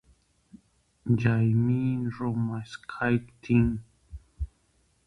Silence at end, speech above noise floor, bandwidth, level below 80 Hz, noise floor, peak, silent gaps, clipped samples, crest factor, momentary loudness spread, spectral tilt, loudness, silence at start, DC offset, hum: 0.6 s; 42 dB; 6.4 kHz; -46 dBFS; -68 dBFS; -10 dBFS; none; under 0.1%; 18 dB; 16 LU; -9 dB/octave; -27 LUFS; 0.55 s; under 0.1%; none